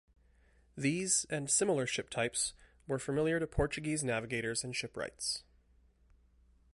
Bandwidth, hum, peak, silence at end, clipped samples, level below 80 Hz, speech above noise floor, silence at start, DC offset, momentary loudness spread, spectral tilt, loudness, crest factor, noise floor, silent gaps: 11.5 kHz; none; -18 dBFS; 1.35 s; under 0.1%; -54 dBFS; 33 dB; 0.75 s; under 0.1%; 9 LU; -3.5 dB/octave; -34 LUFS; 18 dB; -67 dBFS; none